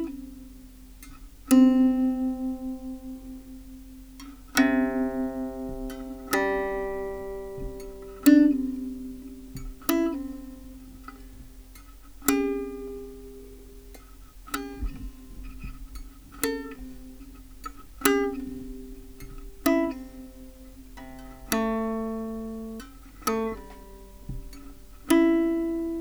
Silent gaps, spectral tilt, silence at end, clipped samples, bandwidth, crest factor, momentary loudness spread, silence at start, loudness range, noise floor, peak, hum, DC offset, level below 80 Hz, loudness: none; -4.5 dB/octave; 0 s; under 0.1%; over 20 kHz; 26 dB; 25 LU; 0 s; 11 LU; -47 dBFS; -4 dBFS; none; under 0.1%; -44 dBFS; -26 LUFS